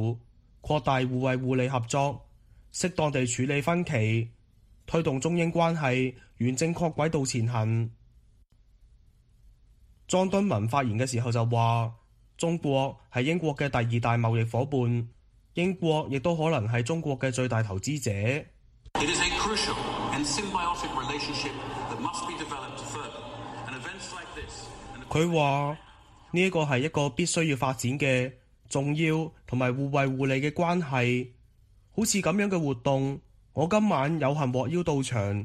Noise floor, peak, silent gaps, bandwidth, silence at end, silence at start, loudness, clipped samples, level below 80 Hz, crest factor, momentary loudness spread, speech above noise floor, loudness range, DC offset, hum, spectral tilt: -60 dBFS; -10 dBFS; none; 13.5 kHz; 0 s; 0 s; -28 LUFS; under 0.1%; -54 dBFS; 18 dB; 12 LU; 33 dB; 4 LU; under 0.1%; none; -5.5 dB/octave